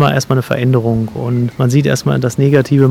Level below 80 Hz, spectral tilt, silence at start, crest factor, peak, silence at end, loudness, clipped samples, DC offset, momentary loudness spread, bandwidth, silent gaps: -44 dBFS; -7 dB/octave; 0 s; 12 dB; 0 dBFS; 0 s; -14 LUFS; 0.4%; under 0.1%; 6 LU; 14.5 kHz; none